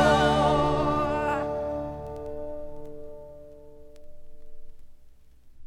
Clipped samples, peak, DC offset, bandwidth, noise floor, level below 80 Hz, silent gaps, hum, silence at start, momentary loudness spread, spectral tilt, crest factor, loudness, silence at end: under 0.1%; -10 dBFS; under 0.1%; 13 kHz; -50 dBFS; -42 dBFS; none; none; 0 s; 24 LU; -6 dB/octave; 18 dB; -26 LUFS; 0 s